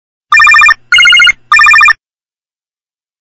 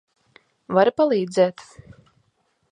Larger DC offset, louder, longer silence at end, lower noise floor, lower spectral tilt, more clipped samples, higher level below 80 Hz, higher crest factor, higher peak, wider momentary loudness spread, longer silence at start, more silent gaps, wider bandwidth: neither; first, -3 LUFS vs -20 LUFS; first, 1.25 s vs 1.1 s; first, under -90 dBFS vs -68 dBFS; second, 3 dB/octave vs -6 dB/octave; first, 3% vs under 0.1%; first, -42 dBFS vs -64 dBFS; second, 8 dB vs 20 dB; first, 0 dBFS vs -4 dBFS; about the same, 5 LU vs 4 LU; second, 0.3 s vs 0.7 s; neither; first, 15 kHz vs 10 kHz